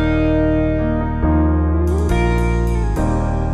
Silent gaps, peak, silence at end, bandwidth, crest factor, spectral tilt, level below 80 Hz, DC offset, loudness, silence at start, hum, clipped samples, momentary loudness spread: none; -6 dBFS; 0 s; 12 kHz; 10 dB; -8 dB/octave; -20 dBFS; under 0.1%; -18 LUFS; 0 s; none; under 0.1%; 3 LU